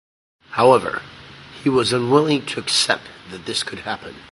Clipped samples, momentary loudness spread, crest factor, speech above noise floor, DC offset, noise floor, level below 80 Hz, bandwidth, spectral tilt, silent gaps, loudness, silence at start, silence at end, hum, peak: under 0.1%; 19 LU; 20 dB; 21 dB; under 0.1%; -40 dBFS; -56 dBFS; 11.5 kHz; -4 dB/octave; none; -19 LUFS; 0.5 s; 0.1 s; none; 0 dBFS